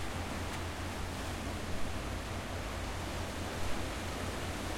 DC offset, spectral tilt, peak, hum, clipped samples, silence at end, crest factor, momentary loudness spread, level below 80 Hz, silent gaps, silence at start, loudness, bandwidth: under 0.1%; -4.5 dB/octave; -22 dBFS; none; under 0.1%; 0 s; 14 dB; 1 LU; -46 dBFS; none; 0 s; -39 LUFS; 16.5 kHz